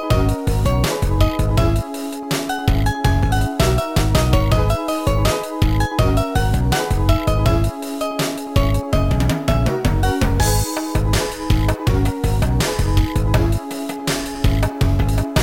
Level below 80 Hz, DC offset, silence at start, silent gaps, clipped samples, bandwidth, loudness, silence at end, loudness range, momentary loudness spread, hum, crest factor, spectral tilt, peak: -22 dBFS; 1%; 0 s; none; under 0.1%; 17 kHz; -19 LUFS; 0 s; 1 LU; 5 LU; none; 14 dB; -5.5 dB/octave; -2 dBFS